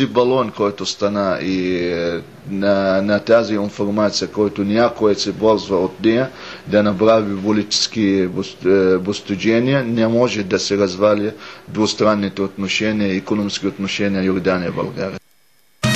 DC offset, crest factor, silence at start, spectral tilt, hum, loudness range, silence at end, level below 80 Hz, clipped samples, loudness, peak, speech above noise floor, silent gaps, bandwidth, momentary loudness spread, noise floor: 0.2%; 16 dB; 0 s; -5 dB/octave; none; 2 LU; 0 s; -50 dBFS; under 0.1%; -18 LUFS; -2 dBFS; 41 dB; none; 12.5 kHz; 8 LU; -59 dBFS